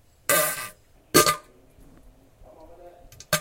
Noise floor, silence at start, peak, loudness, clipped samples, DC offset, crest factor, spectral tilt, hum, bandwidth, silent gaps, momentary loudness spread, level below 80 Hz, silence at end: -53 dBFS; 0.3 s; -2 dBFS; -22 LUFS; under 0.1%; under 0.1%; 26 dB; -2 dB/octave; none; 16 kHz; none; 14 LU; -54 dBFS; 0 s